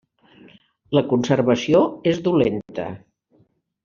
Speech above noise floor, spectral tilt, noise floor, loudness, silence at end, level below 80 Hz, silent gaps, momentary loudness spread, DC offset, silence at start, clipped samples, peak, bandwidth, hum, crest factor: 42 dB; -6.5 dB/octave; -61 dBFS; -20 LUFS; 0.85 s; -58 dBFS; none; 13 LU; under 0.1%; 0.9 s; under 0.1%; -4 dBFS; 7.2 kHz; none; 18 dB